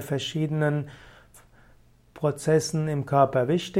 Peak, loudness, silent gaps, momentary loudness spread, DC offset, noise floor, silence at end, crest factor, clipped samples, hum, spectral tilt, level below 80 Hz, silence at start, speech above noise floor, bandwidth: -6 dBFS; -25 LUFS; none; 7 LU; under 0.1%; -56 dBFS; 0 s; 20 dB; under 0.1%; none; -6 dB/octave; -58 dBFS; 0 s; 32 dB; 15.5 kHz